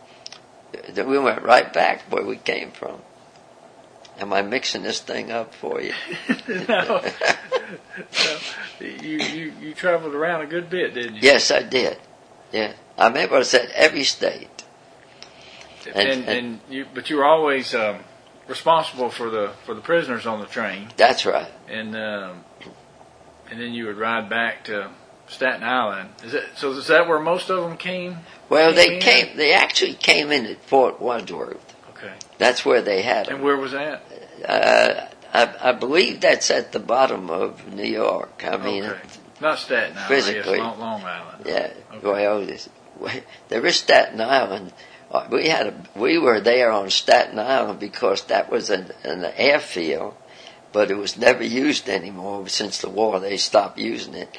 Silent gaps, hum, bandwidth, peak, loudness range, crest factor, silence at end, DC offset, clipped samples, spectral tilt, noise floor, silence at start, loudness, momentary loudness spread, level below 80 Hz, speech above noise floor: none; none; 11 kHz; 0 dBFS; 8 LU; 22 dB; 0 s; under 0.1%; under 0.1%; -2.5 dB/octave; -48 dBFS; 0.3 s; -20 LUFS; 16 LU; -64 dBFS; 28 dB